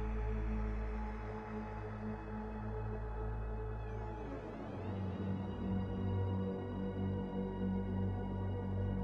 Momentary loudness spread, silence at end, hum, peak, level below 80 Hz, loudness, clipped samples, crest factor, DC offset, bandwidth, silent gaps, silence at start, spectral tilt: 6 LU; 0 s; none; -26 dBFS; -46 dBFS; -41 LUFS; under 0.1%; 14 dB; under 0.1%; 5.8 kHz; none; 0 s; -9.5 dB/octave